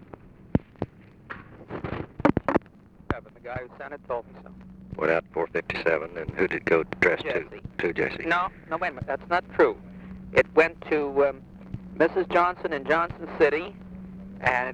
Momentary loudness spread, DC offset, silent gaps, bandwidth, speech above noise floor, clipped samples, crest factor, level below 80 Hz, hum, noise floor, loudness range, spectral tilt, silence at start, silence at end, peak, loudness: 19 LU; under 0.1%; none; 9 kHz; 26 dB; under 0.1%; 22 dB; -50 dBFS; none; -52 dBFS; 6 LU; -7 dB/octave; 0.25 s; 0 s; -6 dBFS; -26 LUFS